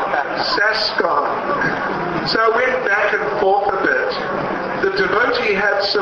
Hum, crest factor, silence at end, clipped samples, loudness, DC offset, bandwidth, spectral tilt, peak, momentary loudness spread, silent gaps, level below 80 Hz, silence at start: none; 14 dB; 0 s; under 0.1%; -17 LUFS; under 0.1%; 7.2 kHz; -4.5 dB/octave; -2 dBFS; 5 LU; none; -50 dBFS; 0 s